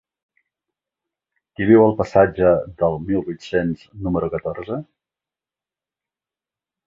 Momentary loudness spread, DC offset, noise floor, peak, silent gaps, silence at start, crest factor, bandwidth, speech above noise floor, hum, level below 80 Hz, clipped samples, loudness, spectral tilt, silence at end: 14 LU; under 0.1%; under -90 dBFS; -2 dBFS; none; 1.6 s; 20 dB; 7.6 kHz; over 72 dB; none; -46 dBFS; under 0.1%; -19 LUFS; -8.5 dB/octave; 2.05 s